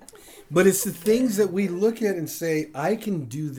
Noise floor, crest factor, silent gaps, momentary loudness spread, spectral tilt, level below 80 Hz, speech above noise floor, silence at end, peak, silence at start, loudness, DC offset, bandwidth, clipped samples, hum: -47 dBFS; 18 dB; none; 8 LU; -5 dB/octave; -60 dBFS; 24 dB; 0 s; -6 dBFS; 0.15 s; -23 LUFS; under 0.1%; over 20 kHz; under 0.1%; none